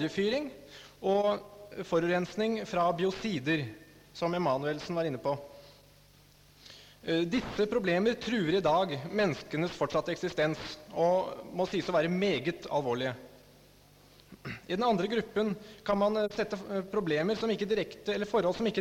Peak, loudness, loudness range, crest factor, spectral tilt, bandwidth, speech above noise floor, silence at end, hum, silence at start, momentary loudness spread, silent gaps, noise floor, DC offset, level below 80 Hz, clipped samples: -18 dBFS; -31 LUFS; 4 LU; 14 dB; -6 dB/octave; 16.5 kHz; 29 dB; 0 s; none; 0 s; 11 LU; none; -59 dBFS; under 0.1%; -62 dBFS; under 0.1%